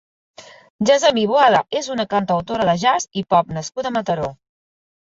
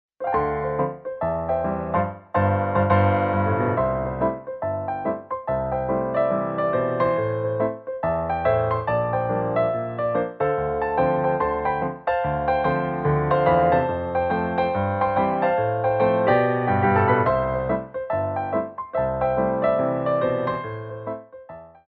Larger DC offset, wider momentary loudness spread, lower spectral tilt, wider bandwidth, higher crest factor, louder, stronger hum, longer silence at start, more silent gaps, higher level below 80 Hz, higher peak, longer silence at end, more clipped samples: neither; about the same, 9 LU vs 8 LU; second, -4 dB/octave vs -11 dB/octave; first, 7.8 kHz vs 4.8 kHz; about the same, 16 dB vs 18 dB; first, -18 LUFS vs -23 LUFS; neither; first, 0.4 s vs 0.2 s; first, 0.70-0.79 s vs none; second, -54 dBFS vs -46 dBFS; first, -2 dBFS vs -6 dBFS; first, 0.7 s vs 0.2 s; neither